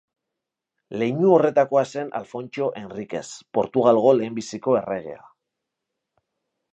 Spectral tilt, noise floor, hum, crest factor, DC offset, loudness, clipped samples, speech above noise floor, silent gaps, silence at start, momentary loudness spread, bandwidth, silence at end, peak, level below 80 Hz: -6.5 dB/octave; -84 dBFS; none; 20 dB; under 0.1%; -22 LUFS; under 0.1%; 63 dB; none; 0.9 s; 15 LU; 8.4 kHz; 1.55 s; -4 dBFS; -68 dBFS